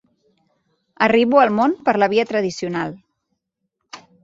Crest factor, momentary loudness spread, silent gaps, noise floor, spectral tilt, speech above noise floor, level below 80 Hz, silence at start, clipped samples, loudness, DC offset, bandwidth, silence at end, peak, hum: 20 dB; 11 LU; none; -76 dBFS; -5.5 dB/octave; 59 dB; -62 dBFS; 1 s; under 0.1%; -18 LUFS; under 0.1%; 7.8 kHz; 0.25 s; 0 dBFS; none